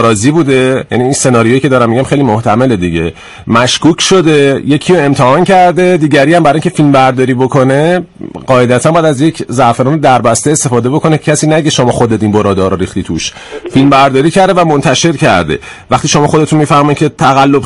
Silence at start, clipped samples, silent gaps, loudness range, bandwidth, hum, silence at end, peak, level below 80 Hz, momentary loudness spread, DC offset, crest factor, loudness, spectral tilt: 0 s; 0.6%; none; 2 LU; 12 kHz; none; 0 s; 0 dBFS; -38 dBFS; 7 LU; under 0.1%; 8 dB; -8 LUFS; -5 dB/octave